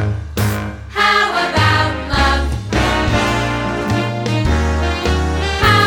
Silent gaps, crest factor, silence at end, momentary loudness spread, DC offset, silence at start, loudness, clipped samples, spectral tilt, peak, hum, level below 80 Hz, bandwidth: none; 14 dB; 0 s; 6 LU; under 0.1%; 0 s; -16 LUFS; under 0.1%; -5 dB/octave; 0 dBFS; none; -24 dBFS; 19 kHz